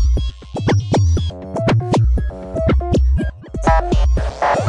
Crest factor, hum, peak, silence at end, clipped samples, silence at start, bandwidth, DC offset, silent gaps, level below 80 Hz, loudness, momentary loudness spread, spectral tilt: 14 dB; none; -2 dBFS; 0 s; under 0.1%; 0 s; 9.8 kHz; under 0.1%; none; -20 dBFS; -18 LUFS; 7 LU; -7 dB/octave